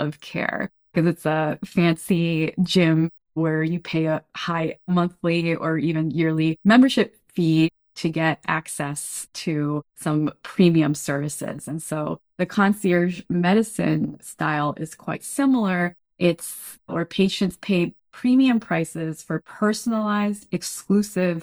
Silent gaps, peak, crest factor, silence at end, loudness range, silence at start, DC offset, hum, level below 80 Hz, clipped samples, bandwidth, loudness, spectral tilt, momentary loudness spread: none; -4 dBFS; 18 dB; 0 s; 3 LU; 0 s; under 0.1%; none; -60 dBFS; under 0.1%; over 20 kHz; -23 LUFS; -6 dB/octave; 10 LU